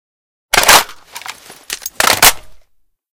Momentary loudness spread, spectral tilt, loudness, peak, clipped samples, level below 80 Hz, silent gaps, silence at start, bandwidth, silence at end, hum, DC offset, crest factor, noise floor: 22 LU; 0.5 dB/octave; -9 LUFS; 0 dBFS; 0.8%; -40 dBFS; none; 0.55 s; over 20 kHz; 0.55 s; none; under 0.1%; 16 dB; -55 dBFS